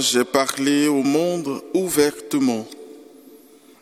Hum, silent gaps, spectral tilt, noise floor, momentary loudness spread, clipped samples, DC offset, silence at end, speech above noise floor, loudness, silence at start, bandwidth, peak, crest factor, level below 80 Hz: none; none; -3.5 dB/octave; -48 dBFS; 9 LU; under 0.1%; under 0.1%; 0.45 s; 28 dB; -20 LUFS; 0 s; 17 kHz; 0 dBFS; 20 dB; -62 dBFS